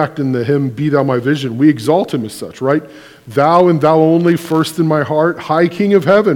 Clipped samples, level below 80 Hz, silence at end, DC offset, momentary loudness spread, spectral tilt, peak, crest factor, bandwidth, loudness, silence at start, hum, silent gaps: 0.2%; -58 dBFS; 0 s; under 0.1%; 7 LU; -7 dB/octave; 0 dBFS; 12 dB; 18 kHz; -13 LUFS; 0 s; none; none